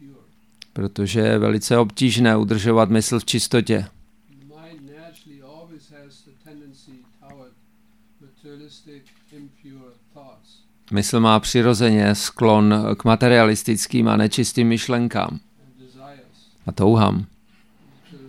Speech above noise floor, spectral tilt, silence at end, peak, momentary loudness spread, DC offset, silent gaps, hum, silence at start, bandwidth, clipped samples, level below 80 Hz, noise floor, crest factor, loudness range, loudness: 40 dB; -5.5 dB/octave; 0 s; 0 dBFS; 12 LU; 0.1%; none; 50 Hz at -50 dBFS; 0.75 s; 15.5 kHz; under 0.1%; -50 dBFS; -59 dBFS; 20 dB; 8 LU; -18 LUFS